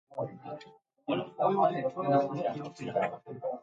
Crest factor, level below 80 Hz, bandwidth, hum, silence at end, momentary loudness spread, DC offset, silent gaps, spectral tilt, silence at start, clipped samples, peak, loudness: 18 dB; -78 dBFS; 7.8 kHz; none; 0 s; 16 LU; under 0.1%; none; -7.5 dB/octave; 0.1 s; under 0.1%; -14 dBFS; -32 LUFS